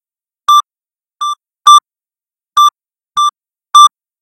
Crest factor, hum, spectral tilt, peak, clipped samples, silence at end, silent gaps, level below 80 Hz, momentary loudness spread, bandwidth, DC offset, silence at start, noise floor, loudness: 12 dB; none; 4.5 dB/octave; 0 dBFS; 1%; 0.35 s; none; -68 dBFS; 14 LU; 16 kHz; under 0.1%; 0.5 s; under -90 dBFS; -9 LUFS